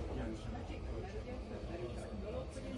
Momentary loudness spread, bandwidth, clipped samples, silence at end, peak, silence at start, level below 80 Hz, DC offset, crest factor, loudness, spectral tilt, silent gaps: 3 LU; 11.5 kHz; under 0.1%; 0 s; -30 dBFS; 0 s; -48 dBFS; under 0.1%; 12 dB; -45 LUFS; -7 dB/octave; none